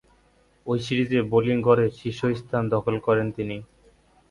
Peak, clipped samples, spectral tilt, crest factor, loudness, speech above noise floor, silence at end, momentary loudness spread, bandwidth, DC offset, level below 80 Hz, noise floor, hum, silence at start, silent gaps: -4 dBFS; under 0.1%; -7.5 dB/octave; 20 dB; -24 LUFS; 38 dB; 0.65 s; 11 LU; 11 kHz; under 0.1%; -54 dBFS; -61 dBFS; none; 0.65 s; none